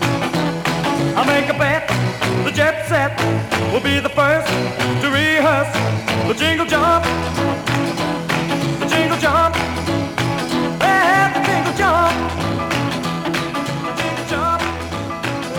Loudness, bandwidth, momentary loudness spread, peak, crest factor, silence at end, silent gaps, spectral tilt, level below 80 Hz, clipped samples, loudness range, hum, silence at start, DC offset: -17 LUFS; 19 kHz; 6 LU; -2 dBFS; 16 dB; 0 s; none; -5 dB/octave; -40 dBFS; under 0.1%; 2 LU; none; 0 s; under 0.1%